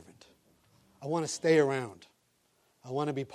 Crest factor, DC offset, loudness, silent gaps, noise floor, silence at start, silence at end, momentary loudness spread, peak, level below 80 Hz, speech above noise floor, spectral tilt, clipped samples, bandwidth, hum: 20 dB; under 0.1%; -30 LUFS; none; -72 dBFS; 0.1 s; 0 s; 16 LU; -14 dBFS; -78 dBFS; 42 dB; -5 dB/octave; under 0.1%; 13 kHz; none